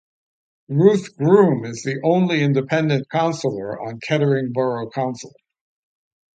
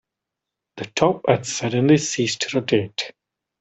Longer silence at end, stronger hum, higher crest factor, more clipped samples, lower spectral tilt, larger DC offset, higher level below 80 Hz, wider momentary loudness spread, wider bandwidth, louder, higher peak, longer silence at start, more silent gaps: first, 1.1 s vs 0.5 s; neither; about the same, 18 dB vs 20 dB; neither; first, -7 dB/octave vs -4.5 dB/octave; neither; about the same, -64 dBFS vs -60 dBFS; about the same, 11 LU vs 12 LU; about the same, 9 kHz vs 8.4 kHz; about the same, -19 LUFS vs -21 LUFS; about the same, -2 dBFS vs -2 dBFS; about the same, 0.7 s vs 0.75 s; neither